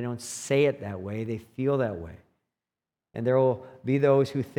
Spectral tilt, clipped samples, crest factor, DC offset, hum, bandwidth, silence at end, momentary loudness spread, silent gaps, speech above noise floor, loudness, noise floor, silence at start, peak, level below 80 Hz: -6.5 dB/octave; under 0.1%; 18 dB; under 0.1%; none; 15.5 kHz; 0.05 s; 12 LU; none; over 64 dB; -27 LUFS; under -90 dBFS; 0 s; -10 dBFS; -66 dBFS